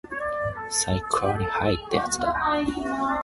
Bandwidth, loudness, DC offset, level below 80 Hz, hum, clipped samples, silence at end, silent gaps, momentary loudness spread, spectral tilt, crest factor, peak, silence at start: 12 kHz; -25 LUFS; under 0.1%; -44 dBFS; none; under 0.1%; 0 s; none; 4 LU; -4 dB/octave; 18 dB; -6 dBFS; 0.05 s